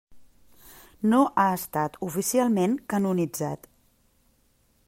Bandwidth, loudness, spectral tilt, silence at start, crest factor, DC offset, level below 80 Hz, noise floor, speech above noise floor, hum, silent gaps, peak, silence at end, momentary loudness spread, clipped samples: 16 kHz; -25 LUFS; -5.5 dB/octave; 0.1 s; 18 dB; under 0.1%; -62 dBFS; -65 dBFS; 41 dB; none; none; -10 dBFS; 1.3 s; 8 LU; under 0.1%